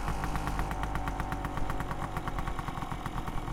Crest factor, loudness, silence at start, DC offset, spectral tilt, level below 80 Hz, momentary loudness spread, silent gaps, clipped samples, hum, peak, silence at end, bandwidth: 16 dB; -36 LUFS; 0 s; under 0.1%; -6 dB/octave; -38 dBFS; 3 LU; none; under 0.1%; none; -16 dBFS; 0 s; 16.5 kHz